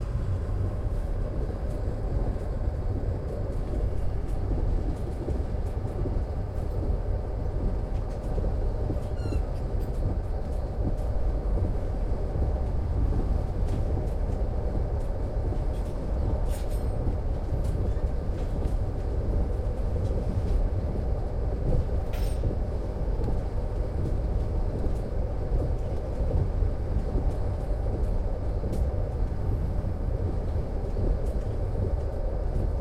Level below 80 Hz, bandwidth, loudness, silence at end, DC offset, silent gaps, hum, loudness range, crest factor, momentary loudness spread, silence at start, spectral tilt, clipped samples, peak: -28 dBFS; 9.6 kHz; -31 LUFS; 0 s; under 0.1%; none; none; 2 LU; 14 dB; 3 LU; 0 s; -9 dB/octave; under 0.1%; -14 dBFS